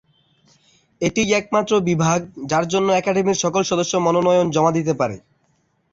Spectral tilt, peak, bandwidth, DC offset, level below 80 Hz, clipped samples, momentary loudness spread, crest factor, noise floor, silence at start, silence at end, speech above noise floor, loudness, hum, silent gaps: -5 dB/octave; -4 dBFS; 7.8 kHz; under 0.1%; -54 dBFS; under 0.1%; 6 LU; 16 dB; -64 dBFS; 1 s; 0.75 s; 46 dB; -19 LUFS; none; none